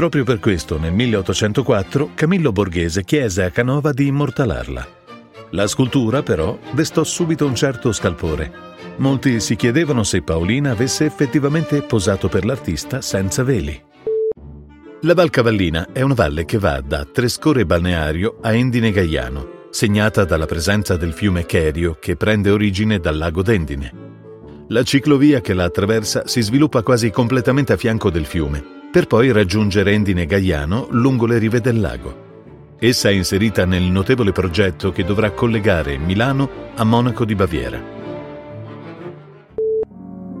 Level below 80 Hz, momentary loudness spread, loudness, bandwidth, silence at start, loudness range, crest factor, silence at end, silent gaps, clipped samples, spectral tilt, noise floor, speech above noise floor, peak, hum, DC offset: -36 dBFS; 12 LU; -17 LUFS; 16 kHz; 0 s; 3 LU; 16 dB; 0 s; none; under 0.1%; -5.5 dB/octave; -40 dBFS; 23 dB; -2 dBFS; none; under 0.1%